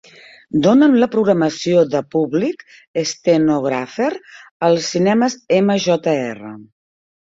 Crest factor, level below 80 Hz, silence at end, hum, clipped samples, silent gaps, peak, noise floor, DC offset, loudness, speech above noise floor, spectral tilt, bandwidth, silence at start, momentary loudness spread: 16 dB; -58 dBFS; 0.65 s; none; under 0.1%; 2.88-2.94 s, 4.51-4.60 s; -2 dBFS; -44 dBFS; under 0.1%; -17 LUFS; 28 dB; -5.5 dB/octave; 7.8 kHz; 0.55 s; 10 LU